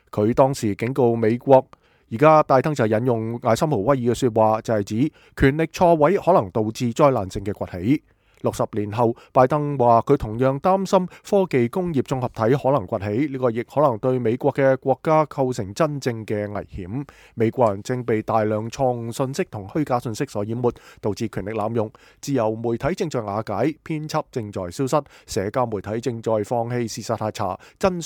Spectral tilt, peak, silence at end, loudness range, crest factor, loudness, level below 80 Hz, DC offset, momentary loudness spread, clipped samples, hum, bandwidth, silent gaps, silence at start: -7 dB/octave; -2 dBFS; 0 s; 6 LU; 20 dB; -22 LUFS; -48 dBFS; under 0.1%; 10 LU; under 0.1%; none; 18 kHz; none; 0.15 s